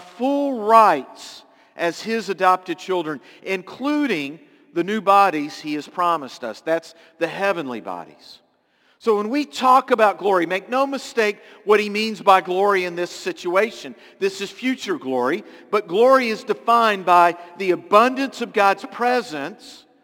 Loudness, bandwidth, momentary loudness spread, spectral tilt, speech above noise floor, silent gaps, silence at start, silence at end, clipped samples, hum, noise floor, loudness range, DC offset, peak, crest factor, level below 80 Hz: -20 LUFS; 17 kHz; 14 LU; -4.5 dB/octave; 41 dB; none; 0 s; 0.3 s; under 0.1%; none; -61 dBFS; 6 LU; under 0.1%; 0 dBFS; 20 dB; -76 dBFS